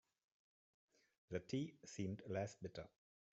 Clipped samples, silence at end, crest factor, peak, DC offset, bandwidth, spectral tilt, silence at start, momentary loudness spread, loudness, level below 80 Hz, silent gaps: under 0.1%; 0.45 s; 20 dB; -30 dBFS; under 0.1%; 8 kHz; -6.5 dB/octave; 1.3 s; 9 LU; -49 LUFS; -78 dBFS; none